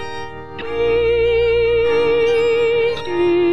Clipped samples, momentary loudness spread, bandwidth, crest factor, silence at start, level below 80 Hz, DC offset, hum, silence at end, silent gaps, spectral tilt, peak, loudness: under 0.1%; 13 LU; 8 kHz; 10 dB; 0 s; -38 dBFS; 2%; none; 0 s; none; -6 dB/octave; -6 dBFS; -16 LUFS